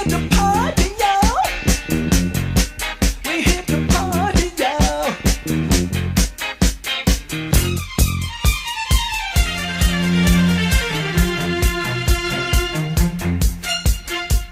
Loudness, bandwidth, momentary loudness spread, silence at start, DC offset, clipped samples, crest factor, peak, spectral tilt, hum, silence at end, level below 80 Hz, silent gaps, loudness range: -19 LUFS; 16 kHz; 5 LU; 0 s; under 0.1%; under 0.1%; 16 dB; 0 dBFS; -4.5 dB/octave; none; 0 s; -22 dBFS; none; 2 LU